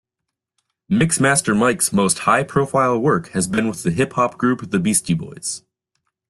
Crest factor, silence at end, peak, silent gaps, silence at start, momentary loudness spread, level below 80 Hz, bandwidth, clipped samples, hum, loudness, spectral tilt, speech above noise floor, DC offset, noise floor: 16 dB; 0.7 s; -2 dBFS; none; 0.9 s; 7 LU; -52 dBFS; 12.5 kHz; under 0.1%; none; -18 LUFS; -4.5 dB/octave; 63 dB; under 0.1%; -82 dBFS